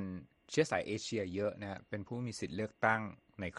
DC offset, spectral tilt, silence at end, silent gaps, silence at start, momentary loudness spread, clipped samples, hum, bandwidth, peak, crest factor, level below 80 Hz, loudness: under 0.1%; -5 dB/octave; 0 s; none; 0 s; 12 LU; under 0.1%; none; 11.5 kHz; -14 dBFS; 24 dB; -68 dBFS; -37 LUFS